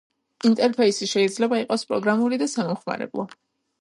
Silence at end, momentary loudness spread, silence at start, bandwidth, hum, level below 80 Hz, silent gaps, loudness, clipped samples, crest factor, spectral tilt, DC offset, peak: 0.55 s; 9 LU; 0.45 s; 11.5 kHz; none; -72 dBFS; none; -23 LUFS; under 0.1%; 16 dB; -4.5 dB/octave; under 0.1%; -8 dBFS